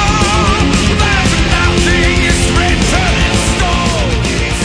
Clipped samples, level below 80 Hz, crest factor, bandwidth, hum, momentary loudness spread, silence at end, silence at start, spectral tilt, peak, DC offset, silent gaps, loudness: under 0.1%; -16 dBFS; 10 dB; 10.5 kHz; none; 3 LU; 0 s; 0 s; -4 dB/octave; 0 dBFS; under 0.1%; none; -11 LUFS